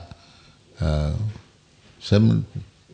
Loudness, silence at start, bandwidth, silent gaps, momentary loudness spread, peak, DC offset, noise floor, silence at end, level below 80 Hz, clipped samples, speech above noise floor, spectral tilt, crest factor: -23 LUFS; 0 s; 9 kHz; none; 21 LU; -6 dBFS; under 0.1%; -54 dBFS; 0.3 s; -36 dBFS; under 0.1%; 33 dB; -8 dB/octave; 18 dB